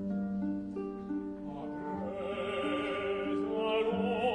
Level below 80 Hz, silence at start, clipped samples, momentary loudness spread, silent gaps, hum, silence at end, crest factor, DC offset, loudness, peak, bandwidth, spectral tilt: -62 dBFS; 0 s; under 0.1%; 9 LU; none; none; 0 s; 14 dB; under 0.1%; -35 LUFS; -20 dBFS; 10 kHz; -7 dB/octave